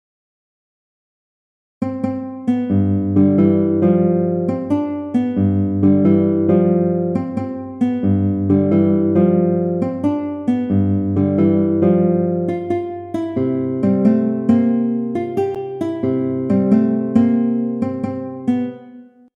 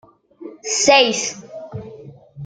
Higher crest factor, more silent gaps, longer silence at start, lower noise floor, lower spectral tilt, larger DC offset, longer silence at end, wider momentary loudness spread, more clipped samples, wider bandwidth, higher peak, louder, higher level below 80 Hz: about the same, 16 dB vs 20 dB; neither; first, 1.8 s vs 0.4 s; about the same, -41 dBFS vs -40 dBFS; first, -11 dB/octave vs -1.5 dB/octave; neither; first, 0.35 s vs 0 s; second, 9 LU vs 24 LU; neither; second, 3.9 kHz vs 10 kHz; about the same, -2 dBFS vs -2 dBFS; about the same, -17 LUFS vs -15 LUFS; about the same, -58 dBFS vs -60 dBFS